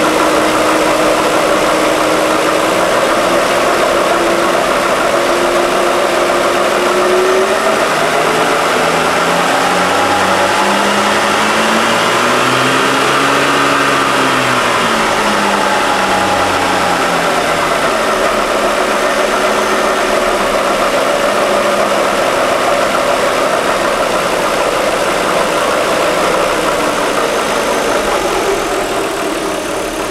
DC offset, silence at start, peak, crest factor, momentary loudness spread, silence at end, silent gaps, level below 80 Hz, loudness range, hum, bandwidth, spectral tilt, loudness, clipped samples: under 0.1%; 0 s; 0 dBFS; 12 dB; 3 LU; 0 s; none; -40 dBFS; 2 LU; none; 19.5 kHz; -3 dB/octave; -12 LUFS; under 0.1%